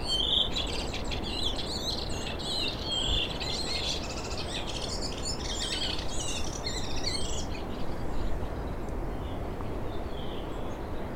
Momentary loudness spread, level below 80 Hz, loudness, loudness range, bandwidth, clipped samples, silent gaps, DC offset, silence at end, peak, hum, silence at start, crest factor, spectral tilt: 9 LU; -38 dBFS; -32 LUFS; 6 LU; 16 kHz; under 0.1%; none; under 0.1%; 0 s; -12 dBFS; none; 0 s; 20 dB; -3.5 dB/octave